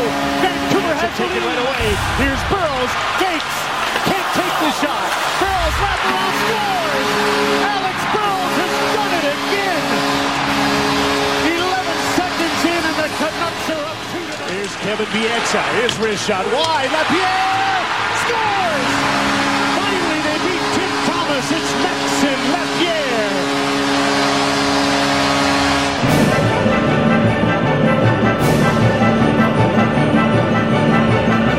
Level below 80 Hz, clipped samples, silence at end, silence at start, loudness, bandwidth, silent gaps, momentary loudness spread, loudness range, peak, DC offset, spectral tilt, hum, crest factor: -38 dBFS; under 0.1%; 0 s; 0 s; -16 LUFS; 16 kHz; none; 4 LU; 3 LU; 0 dBFS; 0.3%; -4.5 dB/octave; none; 16 dB